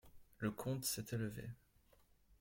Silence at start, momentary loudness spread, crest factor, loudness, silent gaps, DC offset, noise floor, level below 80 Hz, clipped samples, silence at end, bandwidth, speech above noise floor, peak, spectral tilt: 0.05 s; 13 LU; 18 dB; -43 LUFS; none; under 0.1%; -72 dBFS; -68 dBFS; under 0.1%; 0.05 s; 16.5 kHz; 28 dB; -28 dBFS; -4.5 dB/octave